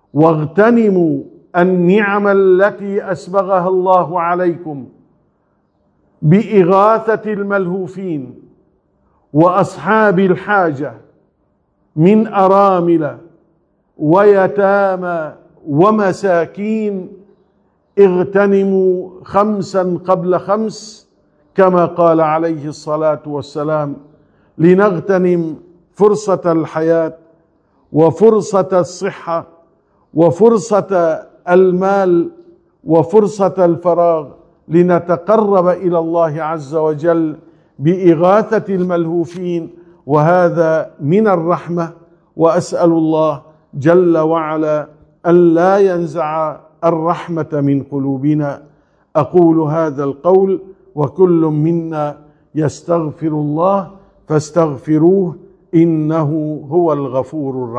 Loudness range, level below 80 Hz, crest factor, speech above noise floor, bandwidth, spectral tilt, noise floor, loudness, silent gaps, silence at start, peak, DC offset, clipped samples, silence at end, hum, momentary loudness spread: 3 LU; -58 dBFS; 14 dB; 48 dB; 9.6 kHz; -8 dB/octave; -60 dBFS; -14 LUFS; none; 0.15 s; 0 dBFS; under 0.1%; 0.2%; 0 s; none; 11 LU